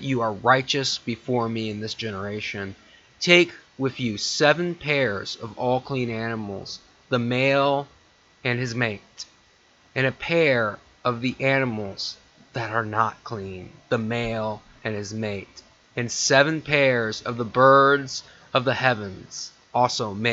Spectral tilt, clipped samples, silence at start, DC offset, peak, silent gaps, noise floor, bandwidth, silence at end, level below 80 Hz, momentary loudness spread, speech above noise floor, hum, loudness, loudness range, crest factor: -4.5 dB/octave; under 0.1%; 0 s; under 0.1%; 0 dBFS; none; -58 dBFS; 8 kHz; 0 s; -58 dBFS; 16 LU; 35 dB; none; -23 LUFS; 7 LU; 24 dB